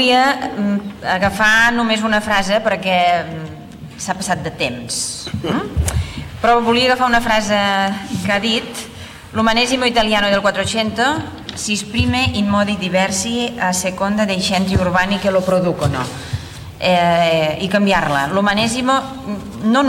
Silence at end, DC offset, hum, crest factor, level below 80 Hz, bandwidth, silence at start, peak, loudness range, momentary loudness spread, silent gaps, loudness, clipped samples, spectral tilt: 0 s; under 0.1%; none; 14 dB; -36 dBFS; 16.5 kHz; 0 s; -2 dBFS; 3 LU; 11 LU; none; -16 LUFS; under 0.1%; -4 dB/octave